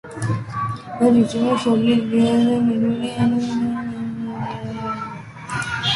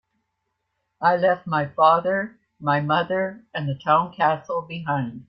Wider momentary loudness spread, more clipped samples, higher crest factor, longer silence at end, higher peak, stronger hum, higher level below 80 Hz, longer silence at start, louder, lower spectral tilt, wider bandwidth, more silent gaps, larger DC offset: about the same, 11 LU vs 11 LU; neither; about the same, 16 dB vs 20 dB; about the same, 0 s vs 0.05 s; about the same, -4 dBFS vs -4 dBFS; neither; first, -52 dBFS vs -64 dBFS; second, 0.05 s vs 1 s; about the same, -20 LUFS vs -22 LUFS; second, -6 dB/octave vs -8 dB/octave; first, 11.5 kHz vs 6 kHz; neither; neither